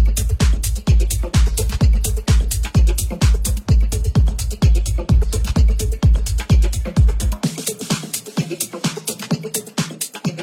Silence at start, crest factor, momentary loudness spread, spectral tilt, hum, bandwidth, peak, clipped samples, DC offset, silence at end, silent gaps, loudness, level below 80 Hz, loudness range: 0 s; 12 dB; 6 LU; -5 dB/octave; none; 16.5 kHz; -4 dBFS; under 0.1%; under 0.1%; 0 s; none; -19 LUFS; -18 dBFS; 4 LU